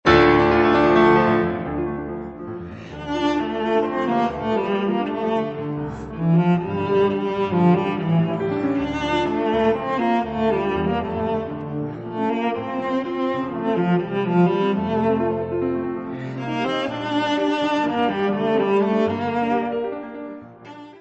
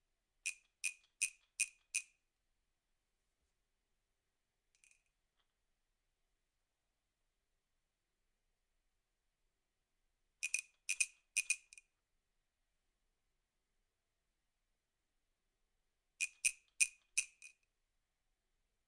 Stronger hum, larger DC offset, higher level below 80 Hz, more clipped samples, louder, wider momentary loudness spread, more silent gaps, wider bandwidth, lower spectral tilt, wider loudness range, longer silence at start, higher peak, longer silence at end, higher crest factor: neither; neither; first, -46 dBFS vs -86 dBFS; neither; first, -21 LUFS vs -40 LUFS; first, 13 LU vs 9 LU; neither; second, 8 kHz vs 11.5 kHz; first, -7.5 dB/octave vs 5.5 dB/octave; second, 3 LU vs 8 LU; second, 0.05 s vs 0.45 s; first, -2 dBFS vs -14 dBFS; second, 0 s vs 1.4 s; second, 18 dB vs 36 dB